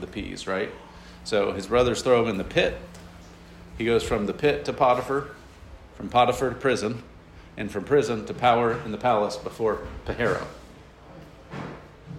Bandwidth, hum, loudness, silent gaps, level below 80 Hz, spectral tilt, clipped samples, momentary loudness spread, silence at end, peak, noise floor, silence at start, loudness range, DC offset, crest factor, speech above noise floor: 14.5 kHz; none; -25 LUFS; none; -46 dBFS; -5 dB/octave; under 0.1%; 19 LU; 0 s; -6 dBFS; -47 dBFS; 0 s; 2 LU; under 0.1%; 20 dB; 23 dB